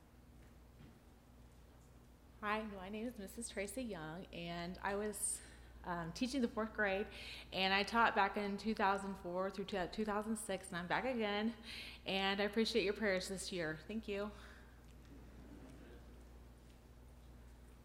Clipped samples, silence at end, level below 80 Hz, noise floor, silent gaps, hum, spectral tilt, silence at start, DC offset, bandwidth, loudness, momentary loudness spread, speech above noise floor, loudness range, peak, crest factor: under 0.1%; 0 s; -62 dBFS; -62 dBFS; none; 60 Hz at -70 dBFS; -3.5 dB/octave; 0 s; under 0.1%; 16 kHz; -40 LUFS; 23 LU; 22 dB; 11 LU; -18 dBFS; 24 dB